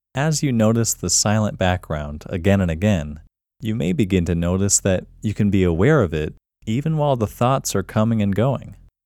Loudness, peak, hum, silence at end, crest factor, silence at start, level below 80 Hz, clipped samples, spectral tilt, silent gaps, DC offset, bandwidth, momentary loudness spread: -20 LUFS; -2 dBFS; none; 0.35 s; 18 dB; 0.15 s; -40 dBFS; under 0.1%; -5 dB/octave; none; under 0.1%; 16.5 kHz; 11 LU